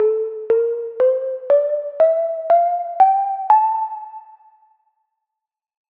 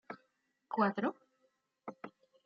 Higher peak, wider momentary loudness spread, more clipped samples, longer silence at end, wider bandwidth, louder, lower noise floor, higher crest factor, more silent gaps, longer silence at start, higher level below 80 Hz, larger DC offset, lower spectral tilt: first, -2 dBFS vs -18 dBFS; second, 8 LU vs 20 LU; neither; first, 1.75 s vs 0.35 s; second, 4.3 kHz vs 6 kHz; first, -18 LUFS vs -35 LUFS; first, -85 dBFS vs -80 dBFS; second, 16 dB vs 22 dB; neither; about the same, 0 s vs 0.1 s; first, -76 dBFS vs -88 dBFS; neither; first, -6.5 dB/octave vs -5 dB/octave